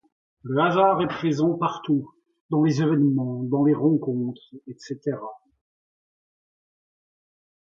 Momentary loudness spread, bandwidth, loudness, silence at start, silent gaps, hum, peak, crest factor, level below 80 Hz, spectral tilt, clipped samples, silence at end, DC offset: 17 LU; 7.4 kHz; -23 LUFS; 0.45 s; 2.40-2.49 s; none; -6 dBFS; 18 dB; -66 dBFS; -8 dB/octave; under 0.1%; 2.25 s; under 0.1%